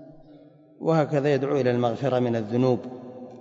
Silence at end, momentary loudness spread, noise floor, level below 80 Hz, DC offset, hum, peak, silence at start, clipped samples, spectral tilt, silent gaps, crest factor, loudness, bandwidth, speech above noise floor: 0 s; 12 LU; -51 dBFS; -66 dBFS; under 0.1%; none; -8 dBFS; 0 s; under 0.1%; -8 dB/octave; none; 16 dB; -24 LUFS; 7.8 kHz; 28 dB